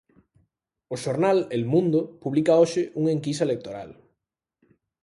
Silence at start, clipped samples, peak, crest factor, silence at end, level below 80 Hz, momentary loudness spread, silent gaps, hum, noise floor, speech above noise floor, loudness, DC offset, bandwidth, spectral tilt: 0.9 s; under 0.1%; -8 dBFS; 18 dB; 1.1 s; -66 dBFS; 16 LU; none; none; -82 dBFS; 59 dB; -23 LUFS; under 0.1%; 11.5 kHz; -6.5 dB/octave